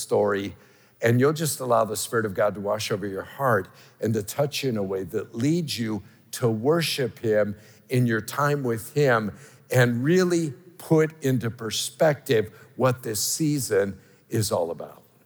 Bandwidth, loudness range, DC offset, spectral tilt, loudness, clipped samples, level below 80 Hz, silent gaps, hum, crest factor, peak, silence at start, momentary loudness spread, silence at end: over 20 kHz; 3 LU; under 0.1%; -5 dB/octave; -25 LUFS; under 0.1%; -70 dBFS; none; none; 18 dB; -8 dBFS; 0 s; 10 LU; 0.3 s